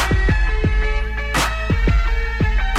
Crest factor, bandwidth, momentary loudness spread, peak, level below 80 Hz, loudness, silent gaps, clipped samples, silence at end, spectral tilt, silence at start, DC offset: 10 dB; 14.5 kHz; 4 LU; -6 dBFS; -18 dBFS; -20 LUFS; none; under 0.1%; 0 s; -5 dB/octave; 0 s; under 0.1%